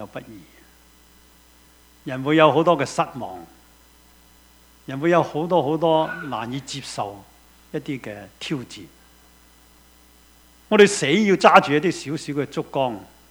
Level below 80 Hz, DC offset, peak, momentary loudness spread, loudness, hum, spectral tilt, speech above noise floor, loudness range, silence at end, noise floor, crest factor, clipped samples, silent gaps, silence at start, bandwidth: -58 dBFS; under 0.1%; 0 dBFS; 21 LU; -20 LUFS; none; -5 dB/octave; 32 dB; 14 LU; 0.25 s; -53 dBFS; 22 dB; under 0.1%; none; 0 s; over 20 kHz